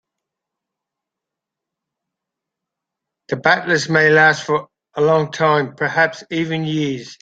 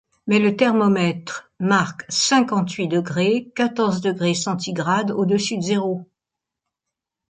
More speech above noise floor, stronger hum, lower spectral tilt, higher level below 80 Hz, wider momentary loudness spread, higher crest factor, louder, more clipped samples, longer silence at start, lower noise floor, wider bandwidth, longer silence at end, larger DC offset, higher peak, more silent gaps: about the same, 67 dB vs 65 dB; neither; about the same, -5 dB/octave vs -4.5 dB/octave; about the same, -62 dBFS vs -64 dBFS; first, 10 LU vs 7 LU; about the same, 18 dB vs 16 dB; first, -16 LUFS vs -20 LUFS; neither; first, 3.3 s vs 0.25 s; about the same, -84 dBFS vs -85 dBFS; about the same, 9 kHz vs 9.4 kHz; second, 0.05 s vs 1.25 s; neither; about the same, -2 dBFS vs -4 dBFS; neither